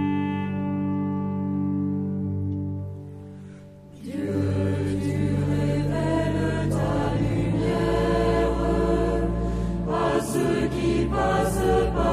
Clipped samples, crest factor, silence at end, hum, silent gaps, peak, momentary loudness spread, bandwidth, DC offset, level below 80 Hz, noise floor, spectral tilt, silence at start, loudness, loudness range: under 0.1%; 14 dB; 0 s; none; none; -10 dBFS; 9 LU; 15.5 kHz; under 0.1%; -34 dBFS; -44 dBFS; -7.5 dB/octave; 0 s; -25 LUFS; 5 LU